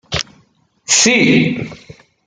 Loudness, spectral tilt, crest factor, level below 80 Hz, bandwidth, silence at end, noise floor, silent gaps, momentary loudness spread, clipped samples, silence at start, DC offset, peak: -12 LUFS; -3 dB/octave; 16 dB; -46 dBFS; 10 kHz; 0.35 s; -55 dBFS; none; 21 LU; under 0.1%; 0.1 s; under 0.1%; 0 dBFS